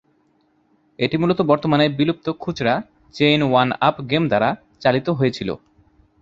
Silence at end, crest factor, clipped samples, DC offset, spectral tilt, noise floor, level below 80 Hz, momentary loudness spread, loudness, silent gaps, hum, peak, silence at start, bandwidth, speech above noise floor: 0.65 s; 18 dB; under 0.1%; under 0.1%; -7 dB/octave; -62 dBFS; -54 dBFS; 9 LU; -19 LUFS; none; none; -2 dBFS; 1 s; 7.6 kHz; 43 dB